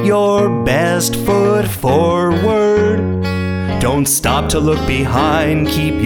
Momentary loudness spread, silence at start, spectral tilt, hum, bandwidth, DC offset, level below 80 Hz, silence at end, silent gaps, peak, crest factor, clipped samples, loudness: 4 LU; 0 s; -5 dB/octave; none; over 20 kHz; under 0.1%; -30 dBFS; 0 s; none; 0 dBFS; 12 dB; under 0.1%; -14 LUFS